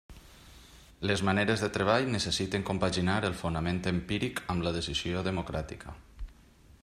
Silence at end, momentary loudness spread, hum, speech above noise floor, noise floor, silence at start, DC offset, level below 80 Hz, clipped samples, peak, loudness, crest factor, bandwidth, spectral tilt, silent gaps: 0.1 s; 16 LU; none; 27 dB; -57 dBFS; 0.1 s; under 0.1%; -50 dBFS; under 0.1%; -12 dBFS; -30 LUFS; 20 dB; 14.5 kHz; -5 dB/octave; none